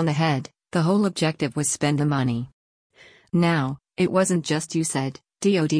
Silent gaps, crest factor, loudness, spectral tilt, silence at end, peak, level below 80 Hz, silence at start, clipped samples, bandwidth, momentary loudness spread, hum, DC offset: 2.53-2.90 s; 14 dB; -23 LUFS; -5.5 dB/octave; 0 s; -8 dBFS; -60 dBFS; 0 s; under 0.1%; 10.5 kHz; 7 LU; none; under 0.1%